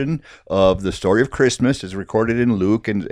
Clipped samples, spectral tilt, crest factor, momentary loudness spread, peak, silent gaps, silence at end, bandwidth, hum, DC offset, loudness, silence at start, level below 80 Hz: under 0.1%; -6 dB/octave; 16 dB; 8 LU; -2 dBFS; none; 0 s; 11.5 kHz; none; under 0.1%; -19 LUFS; 0 s; -42 dBFS